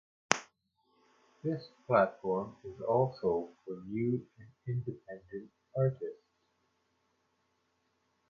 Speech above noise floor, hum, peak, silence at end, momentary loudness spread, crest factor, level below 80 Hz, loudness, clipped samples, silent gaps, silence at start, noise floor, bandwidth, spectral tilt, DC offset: 43 dB; none; 0 dBFS; 2.15 s; 16 LU; 36 dB; -70 dBFS; -34 LUFS; under 0.1%; none; 0.3 s; -77 dBFS; 9.2 kHz; -5.5 dB/octave; under 0.1%